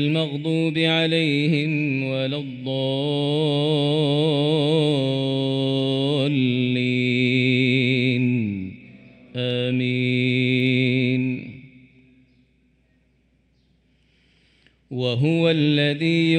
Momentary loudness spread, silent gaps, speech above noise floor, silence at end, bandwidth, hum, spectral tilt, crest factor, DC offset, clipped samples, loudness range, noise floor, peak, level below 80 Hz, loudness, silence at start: 7 LU; none; 42 dB; 0 s; 9.4 kHz; none; -7 dB/octave; 14 dB; under 0.1%; under 0.1%; 6 LU; -63 dBFS; -8 dBFS; -64 dBFS; -21 LUFS; 0 s